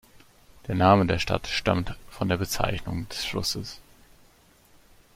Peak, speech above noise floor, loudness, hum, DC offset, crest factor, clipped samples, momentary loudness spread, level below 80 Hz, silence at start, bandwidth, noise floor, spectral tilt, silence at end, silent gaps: -6 dBFS; 33 dB; -26 LUFS; none; under 0.1%; 22 dB; under 0.1%; 16 LU; -44 dBFS; 0.65 s; 16.5 kHz; -58 dBFS; -5 dB/octave; 1.35 s; none